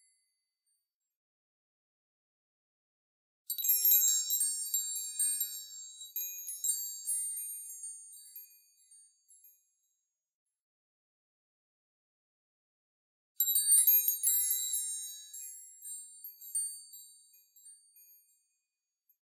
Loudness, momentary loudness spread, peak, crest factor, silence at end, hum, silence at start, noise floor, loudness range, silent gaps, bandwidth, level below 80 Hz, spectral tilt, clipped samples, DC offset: -29 LUFS; 23 LU; -14 dBFS; 24 dB; 1.55 s; none; 3.5 s; -89 dBFS; 14 LU; 10.35-10.46 s, 10.61-13.35 s; 16 kHz; under -90 dBFS; 11 dB/octave; under 0.1%; under 0.1%